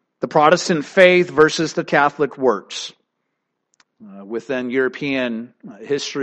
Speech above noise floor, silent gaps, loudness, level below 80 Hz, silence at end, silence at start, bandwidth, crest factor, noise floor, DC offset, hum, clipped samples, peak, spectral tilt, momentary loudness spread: 57 dB; none; -17 LUFS; -60 dBFS; 0 s; 0.2 s; 9.6 kHz; 18 dB; -75 dBFS; under 0.1%; none; under 0.1%; 0 dBFS; -4.5 dB/octave; 17 LU